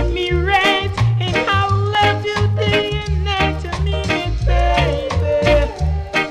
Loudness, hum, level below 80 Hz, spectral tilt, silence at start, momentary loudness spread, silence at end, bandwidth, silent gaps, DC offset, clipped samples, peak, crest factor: -17 LUFS; none; -24 dBFS; -5.5 dB/octave; 0 s; 6 LU; 0 s; 12 kHz; none; under 0.1%; under 0.1%; -6 dBFS; 10 dB